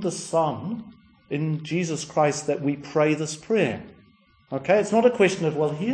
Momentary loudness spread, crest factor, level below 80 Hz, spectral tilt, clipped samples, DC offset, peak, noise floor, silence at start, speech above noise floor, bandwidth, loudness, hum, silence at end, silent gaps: 12 LU; 18 dB; -64 dBFS; -5.5 dB/octave; under 0.1%; under 0.1%; -6 dBFS; -58 dBFS; 0 s; 35 dB; 10.5 kHz; -24 LUFS; none; 0 s; none